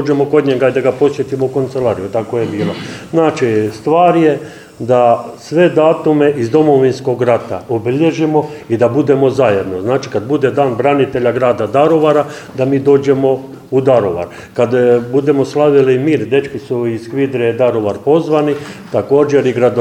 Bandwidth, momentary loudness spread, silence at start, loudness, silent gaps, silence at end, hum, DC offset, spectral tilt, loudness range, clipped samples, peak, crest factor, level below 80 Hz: 12 kHz; 8 LU; 0 s; -13 LUFS; none; 0 s; none; under 0.1%; -7.5 dB/octave; 2 LU; under 0.1%; 0 dBFS; 12 dB; -52 dBFS